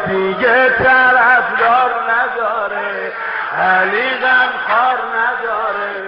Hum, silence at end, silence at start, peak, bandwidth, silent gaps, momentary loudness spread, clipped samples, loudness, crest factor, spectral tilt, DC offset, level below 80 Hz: none; 0 s; 0 s; 0 dBFS; 5.6 kHz; none; 10 LU; under 0.1%; -13 LUFS; 14 dB; -0.5 dB/octave; under 0.1%; -52 dBFS